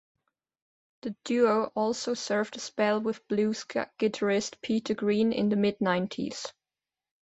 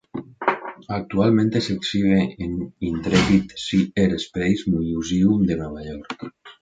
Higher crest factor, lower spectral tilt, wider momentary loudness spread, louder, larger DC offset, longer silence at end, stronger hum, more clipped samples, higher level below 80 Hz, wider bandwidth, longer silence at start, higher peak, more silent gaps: about the same, 18 dB vs 18 dB; second, -5 dB/octave vs -6.5 dB/octave; second, 9 LU vs 15 LU; second, -28 LUFS vs -21 LUFS; neither; first, 0.7 s vs 0.1 s; neither; neither; second, -70 dBFS vs -44 dBFS; about the same, 8.2 kHz vs 9 kHz; first, 1.05 s vs 0.15 s; second, -10 dBFS vs -4 dBFS; neither